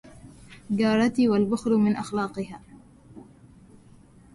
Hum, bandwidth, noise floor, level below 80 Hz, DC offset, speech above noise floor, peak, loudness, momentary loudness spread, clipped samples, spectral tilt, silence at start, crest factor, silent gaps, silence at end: none; 11.5 kHz; -52 dBFS; -58 dBFS; under 0.1%; 29 dB; -10 dBFS; -24 LUFS; 14 LU; under 0.1%; -6.5 dB/octave; 0.05 s; 16 dB; none; 1.15 s